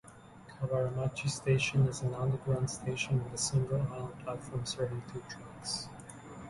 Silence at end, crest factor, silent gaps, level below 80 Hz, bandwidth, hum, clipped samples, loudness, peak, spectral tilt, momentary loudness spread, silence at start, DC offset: 0 s; 18 dB; none; -58 dBFS; 11.5 kHz; none; under 0.1%; -34 LUFS; -18 dBFS; -5 dB/octave; 16 LU; 0.05 s; under 0.1%